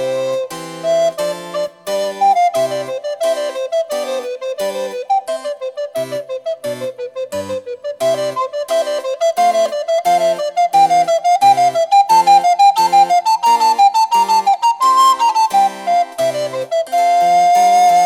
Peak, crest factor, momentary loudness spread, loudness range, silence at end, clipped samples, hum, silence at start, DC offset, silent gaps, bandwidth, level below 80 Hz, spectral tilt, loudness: -2 dBFS; 12 dB; 13 LU; 10 LU; 0 s; under 0.1%; none; 0 s; under 0.1%; none; 16 kHz; -70 dBFS; -2.5 dB/octave; -15 LUFS